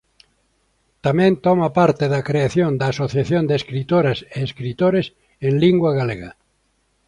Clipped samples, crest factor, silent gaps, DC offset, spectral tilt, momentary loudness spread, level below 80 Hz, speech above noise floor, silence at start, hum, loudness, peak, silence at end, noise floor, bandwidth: under 0.1%; 16 dB; none; under 0.1%; -7.5 dB/octave; 10 LU; -50 dBFS; 47 dB; 1.05 s; none; -19 LUFS; -2 dBFS; 0.75 s; -65 dBFS; 10.5 kHz